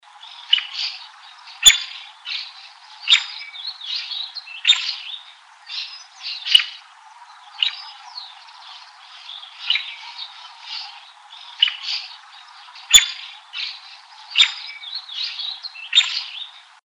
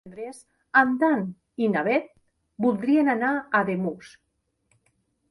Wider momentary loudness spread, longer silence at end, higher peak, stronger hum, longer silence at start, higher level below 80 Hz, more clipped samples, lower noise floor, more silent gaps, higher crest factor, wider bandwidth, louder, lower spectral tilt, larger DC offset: first, 25 LU vs 16 LU; second, 0.3 s vs 1.2 s; first, 0 dBFS vs -6 dBFS; neither; about the same, 0.15 s vs 0.05 s; first, -56 dBFS vs -68 dBFS; neither; second, -45 dBFS vs -71 dBFS; neither; about the same, 24 dB vs 20 dB; about the same, 11 kHz vs 11.5 kHz; first, -18 LUFS vs -24 LUFS; second, 4.5 dB/octave vs -7 dB/octave; neither